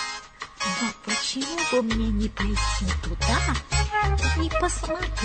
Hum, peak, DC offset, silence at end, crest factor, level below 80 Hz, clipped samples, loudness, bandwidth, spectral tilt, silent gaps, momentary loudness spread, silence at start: none; -10 dBFS; under 0.1%; 0 s; 16 dB; -30 dBFS; under 0.1%; -25 LUFS; 9.2 kHz; -4 dB/octave; none; 5 LU; 0 s